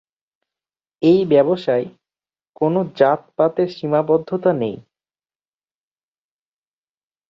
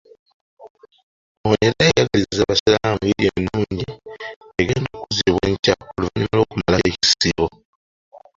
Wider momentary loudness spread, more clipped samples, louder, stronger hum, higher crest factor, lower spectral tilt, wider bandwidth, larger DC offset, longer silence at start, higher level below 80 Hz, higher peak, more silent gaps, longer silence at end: second, 8 LU vs 11 LU; neither; about the same, -18 LUFS vs -19 LUFS; neither; about the same, 20 dB vs 18 dB; first, -9 dB/octave vs -4.5 dB/octave; about the same, 7.2 kHz vs 7.8 kHz; neither; first, 1 s vs 0.6 s; second, -64 dBFS vs -40 dBFS; about the same, 0 dBFS vs -2 dBFS; second, 2.49-2.53 s vs 0.70-0.75 s, 1.03-1.44 s, 2.60-2.66 s, 4.36-4.41 s, 5.59-5.63 s, 7.65-8.11 s; first, 2.5 s vs 0.2 s